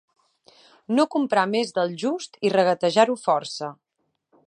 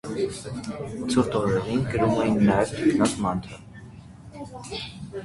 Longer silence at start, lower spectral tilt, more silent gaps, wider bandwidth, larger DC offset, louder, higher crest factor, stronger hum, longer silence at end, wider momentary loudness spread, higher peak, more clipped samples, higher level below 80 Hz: first, 0.9 s vs 0.05 s; second, -4.5 dB/octave vs -6 dB/octave; neither; about the same, 10.5 kHz vs 11.5 kHz; neither; about the same, -23 LUFS vs -25 LUFS; about the same, 20 dB vs 20 dB; neither; first, 0.75 s vs 0 s; second, 8 LU vs 22 LU; about the same, -4 dBFS vs -6 dBFS; neither; second, -78 dBFS vs -48 dBFS